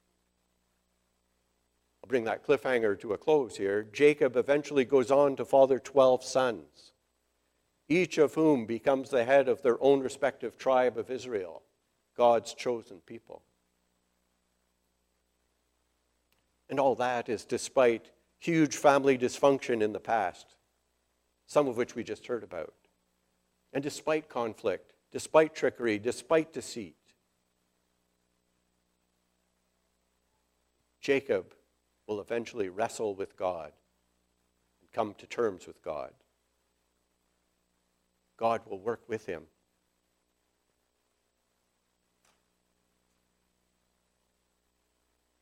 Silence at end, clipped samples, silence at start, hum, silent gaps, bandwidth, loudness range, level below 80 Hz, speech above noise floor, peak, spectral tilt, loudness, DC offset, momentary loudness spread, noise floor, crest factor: 6 s; under 0.1%; 2.1 s; 60 Hz at -70 dBFS; none; 14.5 kHz; 12 LU; -74 dBFS; 49 dB; -8 dBFS; -5 dB/octave; -29 LUFS; under 0.1%; 15 LU; -77 dBFS; 24 dB